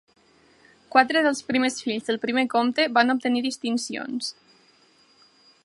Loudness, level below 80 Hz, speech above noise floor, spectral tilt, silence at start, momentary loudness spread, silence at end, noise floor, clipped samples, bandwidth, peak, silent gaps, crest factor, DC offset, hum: -23 LUFS; -72 dBFS; 36 dB; -3 dB/octave; 0.95 s; 10 LU; 1.35 s; -59 dBFS; under 0.1%; 11.5 kHz; -2 dBFS; none; 22 dB; under 0.1%; none